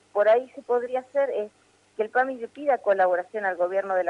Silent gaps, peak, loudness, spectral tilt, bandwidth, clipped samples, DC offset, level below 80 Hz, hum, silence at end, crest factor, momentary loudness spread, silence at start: none; -10 dBFS; -25 LUFS; -5.5 dB/octave; 10 kHz; under 0.1%; under 0.1%; -80 dBFS; none; 0 s; 14 dB; 9 LU; 0.15 s